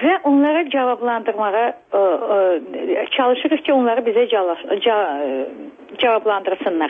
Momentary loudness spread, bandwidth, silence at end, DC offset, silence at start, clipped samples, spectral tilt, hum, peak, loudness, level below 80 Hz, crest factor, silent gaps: 7 LU; 3.8 kHz; 0 s; under 0.1%; 0 s; under 0.1%; -6.5 dB/octave; none; -4 dBFS; -18 LUFS; -68 dBFS; 12 dB; none